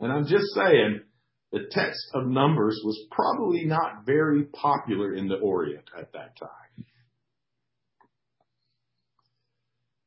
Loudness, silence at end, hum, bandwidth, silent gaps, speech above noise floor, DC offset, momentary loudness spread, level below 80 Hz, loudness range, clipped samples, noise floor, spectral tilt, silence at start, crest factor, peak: -25 LUFS; 3.25 s; none; 5.8 kHz; none; 59 dB; under 0.1%; 20 LU; -68 dBFS; 9 LU; under 0.1%; -84 dBFS; -10.5 dB/octave; 0 s; 20 dB; -8 dBFS